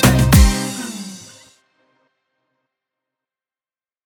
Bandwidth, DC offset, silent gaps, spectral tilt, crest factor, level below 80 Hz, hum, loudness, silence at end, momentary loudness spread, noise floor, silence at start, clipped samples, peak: 19 kHz; under 0.1%; none; -5 dB/octave; 20 dB; -24 dBFS; none; -15 LUFS; 2.85 s; 22 LU; under -90 dBFS; 0 s; under 0.1%; 0 dBFS